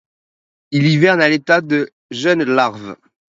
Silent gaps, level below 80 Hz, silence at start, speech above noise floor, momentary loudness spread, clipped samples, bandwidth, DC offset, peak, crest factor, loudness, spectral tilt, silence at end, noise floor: 1.92-2.09 s; -62 dBFS; 0.7 s; over 75 dB; 12 LU; under 0.1%; 7.8 kHz; under 0.1%; 0 dBFS; 16 dB; -15 LUFS; -6 dB/octave; 0.4 s; under -90 dBFS